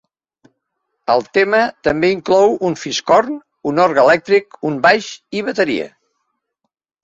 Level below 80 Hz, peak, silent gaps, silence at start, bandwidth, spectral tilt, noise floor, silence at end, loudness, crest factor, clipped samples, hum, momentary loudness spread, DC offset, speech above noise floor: -54 dBFS; 0 dBFS; none; 1.1 s; 7.8 kHz; -4.5 dB/octave; -75 dBFS; 1.15 s; -15 LUFS; 16 dB; under 0.1%; none; 11 LU; under 0.1%; 60 dB